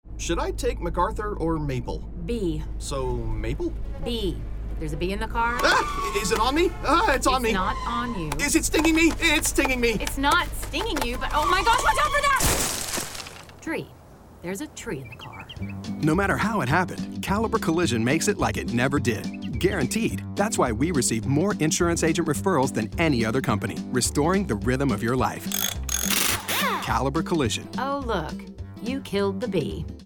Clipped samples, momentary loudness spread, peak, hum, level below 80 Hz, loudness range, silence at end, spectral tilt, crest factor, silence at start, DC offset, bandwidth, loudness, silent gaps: under 0.1%; 13 LU; -6 dBFS; none; -36 dBFS; 7 LU; 0 s; -4 dB/octave; 18 dB; 0.05 s; under 0.1%; 19.5 kHz; -24 LUFS; none